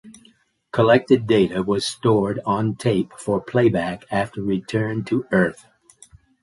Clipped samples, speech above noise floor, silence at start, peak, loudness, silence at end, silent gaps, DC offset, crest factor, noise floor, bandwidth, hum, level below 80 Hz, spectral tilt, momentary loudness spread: under 0.1%; 37 dB; 0.05 s; -2 dBFS; -21 LUFS; 0.9 s; none; under 0.1%; 18 dB; -57 dBFS; 11.5 kHz; none; -52 dBFS; -6.5 dB/octave; 8 LU